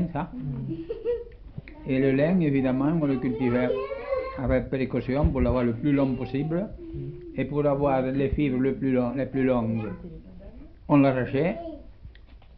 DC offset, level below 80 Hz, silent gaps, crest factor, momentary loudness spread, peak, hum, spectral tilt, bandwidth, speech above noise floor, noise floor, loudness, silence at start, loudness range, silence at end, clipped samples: under 0.1%; -40 dBFS; none; 16 dB; 15 LU; -10 dBFS; none; -11.5 dB/octave; 5.2 kHz; 23 dB; -47 dBFS; -26 LUFS; 0 s; 1 LU; 0 s; under 0.1%